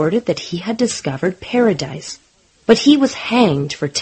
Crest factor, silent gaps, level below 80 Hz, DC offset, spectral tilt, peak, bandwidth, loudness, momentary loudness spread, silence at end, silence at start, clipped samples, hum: 16 dB; none; -52 dBFS; under 0.1%; -5 dB/octave; 0 dBFS; 8.8 kHz; -17 LUFS; 14 LU; 0 s; 0 s; under 0.1%; none